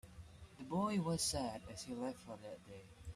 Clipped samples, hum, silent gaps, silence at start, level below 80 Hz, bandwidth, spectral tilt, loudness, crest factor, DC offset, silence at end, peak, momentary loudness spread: under 0.1%; none; none; 0.05 s; -64 dBFS; 14.5 kHz; -4.5 dB/octave; -41 LUFS; 18 dB; under 0.1%; 0 s; -26 dBFS; 20 LU